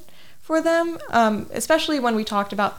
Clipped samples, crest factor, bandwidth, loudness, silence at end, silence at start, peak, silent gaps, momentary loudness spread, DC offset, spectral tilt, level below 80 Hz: under 0.1%; 16 dB; 18 kHz; -21 LUFS; 0 s; 0 s; -6 dBFS; none; 5 LU; under 0.1%; -4 dB/octave; -54 dBFS